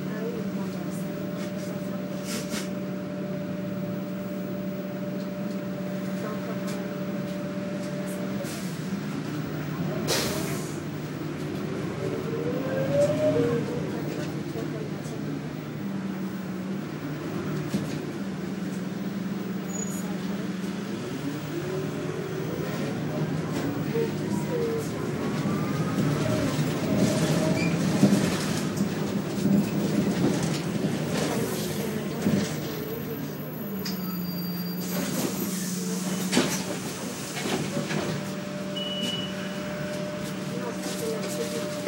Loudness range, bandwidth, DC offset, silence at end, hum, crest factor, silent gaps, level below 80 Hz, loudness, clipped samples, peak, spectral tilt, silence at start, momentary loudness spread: 7 LU; 16 kHz; under 0.1%; 0 s; none; 22 dB; none; -58 dBFS; -29 LUFS; under 0.1%; -6 dBFS; -5.5 dB/octave; 0 s; 8 LU